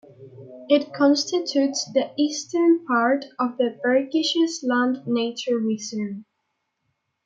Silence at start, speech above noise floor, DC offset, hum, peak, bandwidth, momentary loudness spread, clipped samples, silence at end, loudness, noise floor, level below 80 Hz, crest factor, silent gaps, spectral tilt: 0.2 s; 54 dB; under 0.1%; none; -6 dBFS; 9 kHz; 8 LU; under 0.1%; 1.05 s; -22 LUFS; -76 dBFS; -78 dBFS; 18 dB; none; -3.5 dB/octave